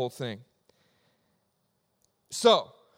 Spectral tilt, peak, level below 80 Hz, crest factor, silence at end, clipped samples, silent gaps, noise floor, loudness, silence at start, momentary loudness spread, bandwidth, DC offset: -3.5 dB/octave; -8 dBFS; -80 dBFS; 24 dB; 0.35 s; under 0.1%; none; -75 dBFS; -26 LUFS; 0 s; 17 LU; 16 kHz; under 0.1%